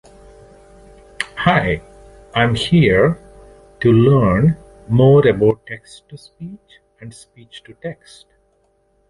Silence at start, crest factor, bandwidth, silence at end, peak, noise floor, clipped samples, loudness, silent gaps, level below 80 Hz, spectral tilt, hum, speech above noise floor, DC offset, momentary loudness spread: 1.2 s; 16 dB; 11.5 kHz; 1.15 s; 0 dBFS; -61 dBFS; under 0.1%; -15 LUFS; none; -40 dBFS; -7.5 dB/octave; none; 45 dB; under 0.1%; 23 LU